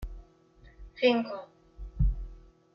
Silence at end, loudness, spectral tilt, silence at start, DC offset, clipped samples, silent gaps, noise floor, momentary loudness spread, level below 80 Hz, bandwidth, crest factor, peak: 0.35 s; -30 LUFS; -8 dB/octave; 0 s; under 0.1%; under 0.1%; none; -58 dBFS; 23 LU; -36 dBFS; 6 kHz; 20 dB; -12 dBFS